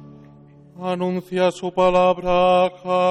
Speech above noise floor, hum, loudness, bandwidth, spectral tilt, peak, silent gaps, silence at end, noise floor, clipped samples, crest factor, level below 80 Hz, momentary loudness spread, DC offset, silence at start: 28 dB; none; -19 LUFS; 10.5 kHz; -6 dB/octave; -6 dBFS; none; 0 s; -47 dBFS; under 0.1%; 14 dB; -48 dBFS; 8 LU; under 0.1%; 0 s